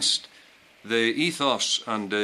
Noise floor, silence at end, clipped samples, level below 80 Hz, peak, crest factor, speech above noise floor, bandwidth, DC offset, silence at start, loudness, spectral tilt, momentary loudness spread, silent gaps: -54 dBFS; 0 s; under 0.1%; -74 dBFS; -8 dBFS; 18 dB; 29 dB; 14.5 kHz; under 0.1%; 0 s; -24 LUFS; -2 dB/octave; 5 LU; none